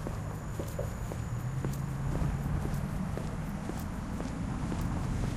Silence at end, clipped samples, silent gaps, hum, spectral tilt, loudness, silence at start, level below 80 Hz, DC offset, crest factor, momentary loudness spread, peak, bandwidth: 0 s; under 0.1%; none; none; -7 dB/octave; -36 LUFS; 0 s; -40 dBFS; under 0.1%; 16 dB; 5 LU; -18 dBFS; 15.5 kHz